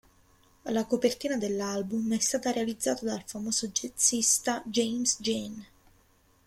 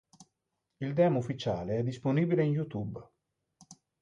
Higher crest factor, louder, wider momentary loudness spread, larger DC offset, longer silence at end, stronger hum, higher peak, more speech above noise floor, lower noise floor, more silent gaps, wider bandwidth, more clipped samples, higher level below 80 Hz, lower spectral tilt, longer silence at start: about the same, 20 dB vs 18 dB; first, -28 LUFS vs -31 LUFS; about the same, 10 LU vs 12 LU; neither; first, 0.8 s vs 0.3 s; neither; first, -10 dBFS vs -14 dBFS; second, 35 dB vs 54 dB; second, -64 dBFS vs -84 dBFS; neither; first, 16 kHz vs 10 kHz; neither; about the same, -64 dBFS vs -64 dBFS; second, -2.5 dB/octave vs -8 dB/octave; first, 0.65 s vs 0.2 s